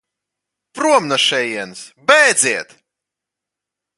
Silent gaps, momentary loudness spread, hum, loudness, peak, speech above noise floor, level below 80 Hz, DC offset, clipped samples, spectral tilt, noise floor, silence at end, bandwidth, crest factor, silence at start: none; 13 LU; none; -14 LUFS; 0 dBFS; 68 dB; -68 dBFS; under 0.1%; under 0.1%; -1 dB/octave; -84 dBFS; 1.35 s; 11.5 kHz; 18 dB; 0.75 s